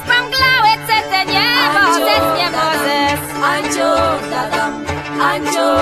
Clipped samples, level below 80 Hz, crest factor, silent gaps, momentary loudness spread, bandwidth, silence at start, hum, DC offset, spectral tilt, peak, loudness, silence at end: under 0.1%; -42 dBFS; 14 dB; none; 7 LU; 14 kHz; 0 s; none; under 0.1%; -3 dB/octave; 0 dBFS; -14 LUFS; 0 s